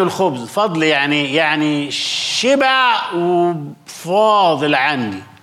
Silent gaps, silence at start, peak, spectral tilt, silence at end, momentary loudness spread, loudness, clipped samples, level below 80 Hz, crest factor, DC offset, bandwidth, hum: none; 0 s; -4 dBFS; -4 dB/octave; 0.2 s; 7 LU; -15 LUFS; under 0.1%; -68 dBFS; 12 dB; under 0.1%; 15 kHz; none